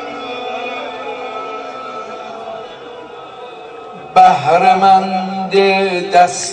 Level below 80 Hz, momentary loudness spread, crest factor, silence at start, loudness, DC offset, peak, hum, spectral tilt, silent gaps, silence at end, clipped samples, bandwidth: -58 dBFS; 22 LU; 16 dB; 0 s; -13 LUFS; under 0.1%; 0 dBFS; none; -4 dB/octave; none; 0 s; 0.1%; 9.4 kHz